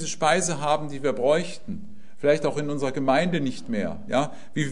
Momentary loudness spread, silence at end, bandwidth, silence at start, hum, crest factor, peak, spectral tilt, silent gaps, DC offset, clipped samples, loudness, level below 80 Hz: 8 LU; 0 s; 11 kHz; 0 s; none; 20 dB; -6 dBFS; -4.5 dB/octave; none; 2%; under 0.1%; -25 LUFS; -58 dBFS